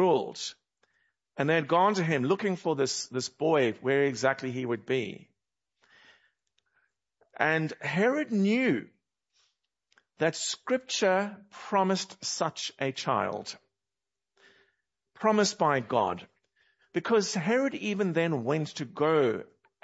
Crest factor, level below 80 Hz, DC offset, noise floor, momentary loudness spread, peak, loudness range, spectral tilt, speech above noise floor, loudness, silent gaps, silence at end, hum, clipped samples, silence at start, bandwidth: 22 dB; -78 dBFS; under 0.1%; under -90 dBFS; 11 LU; -8 dBFS; 5 LU; -4.5 dB/octave; over 62 dB; -28 LUFS; none; 0.4 s; none; under 0.1%; 0 s; 8 kHz